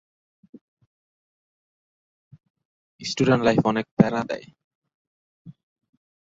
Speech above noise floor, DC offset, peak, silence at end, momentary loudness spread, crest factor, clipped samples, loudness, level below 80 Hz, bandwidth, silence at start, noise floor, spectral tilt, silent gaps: over 69 dB; under 0.1%; -2 dBFS; 0.8 s; 14 LU; 26 dB; under 0.1%; -22 LUFS; -58 dBFS; 7.8 kHz; 3 s; under -90 dBFS; -6.5 dB/octave; 3.91-3.97 s, 4.64-4.82 s, 4.94-5.45 s